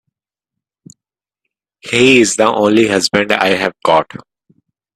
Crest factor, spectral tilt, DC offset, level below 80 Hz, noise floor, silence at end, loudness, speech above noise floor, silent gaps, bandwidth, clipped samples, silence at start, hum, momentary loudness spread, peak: 16 dB; -3.5 dB/octave; under 0.1%; -54 dBFS; -86 dBFS; 0.8 s; -12 LUFS; 74 dB; none; 14 kHz; under 0.1%; 1.85 s; none; 8 LU; 0 dBFS